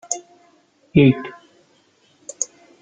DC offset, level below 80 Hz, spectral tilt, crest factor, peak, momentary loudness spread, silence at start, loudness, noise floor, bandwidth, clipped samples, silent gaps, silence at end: under 0.1%; -52 dBFS; -5.5 dB/octave; 20 dB; -2 dBFS; 23 LU; 0.1 s; -19 LUFS; -58 dBFS; 9.6 kHz; under 0.1%; none; 0.35 s